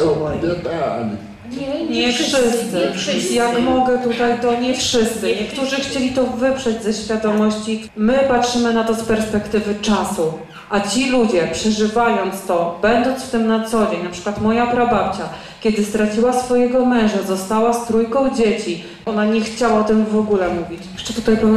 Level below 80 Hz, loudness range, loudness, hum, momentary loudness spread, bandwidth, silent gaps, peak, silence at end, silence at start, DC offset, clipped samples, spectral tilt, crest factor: -44 dBFS; 1 LU; -18 LUFS; none; 7 LU; 13.5 kHz; none; -4 dBFS; 0 s; 0 s; under 0.1%; under 0.1%; -4.5 dB/octave; 12 dB